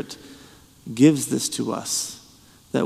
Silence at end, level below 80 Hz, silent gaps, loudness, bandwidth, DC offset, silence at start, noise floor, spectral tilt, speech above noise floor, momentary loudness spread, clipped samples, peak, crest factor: 0 s; -62 dBFS; none; -22 LUFS; 15 kHz; under 0.1%; 0 s; -51 dBFS; -4.5 dB/octave; 29 dB; 23 LU; under 0.1%; -4 dBFS; 20 dB